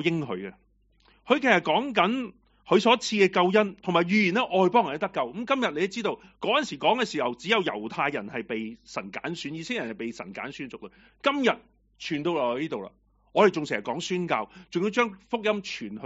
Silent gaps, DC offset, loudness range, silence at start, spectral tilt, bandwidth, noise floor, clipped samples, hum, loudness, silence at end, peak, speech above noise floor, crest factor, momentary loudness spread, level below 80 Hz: none; under 0.1%; 8 LU; 0 s; -3 dB/octave; 8 kHz; -62 dBFS; under 0.1%; none; -26 LUFS; 0 s; -4 dBFS; 36 dB; 22 dB; 14 LU; -66 dBFS